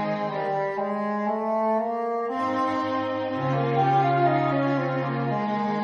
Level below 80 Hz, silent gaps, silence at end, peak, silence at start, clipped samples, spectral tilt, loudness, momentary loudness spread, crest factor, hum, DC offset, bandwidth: -68 dBFS; none; 0 s; -10 dBFS; 0 s; under 0.1%; -8 dB/octave; -25 LUFS; 6 LU; 14 dB; none; under 0.1%; 7 kHz